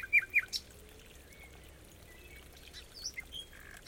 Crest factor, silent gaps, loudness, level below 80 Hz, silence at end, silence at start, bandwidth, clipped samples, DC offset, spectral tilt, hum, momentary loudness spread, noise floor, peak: 22 dB; none; -34 LUFS; -58 dBFS; 0 s; 0 s; 17 kHz; under 0.1%; under 0.1%; -0.5 dB/octave; none; 25 LU; -55 dBFS; -18 dBFS